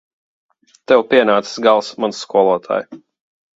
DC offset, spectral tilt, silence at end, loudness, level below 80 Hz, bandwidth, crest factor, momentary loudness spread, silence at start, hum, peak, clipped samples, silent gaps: under 0.1%; -4 dB/octave; 0.6 s; -15 LUFS; -64 dBFS; 8 kHz; 18 dB; 10 LU; 0.9 s; none; 0 dBFS; under 0.1%; none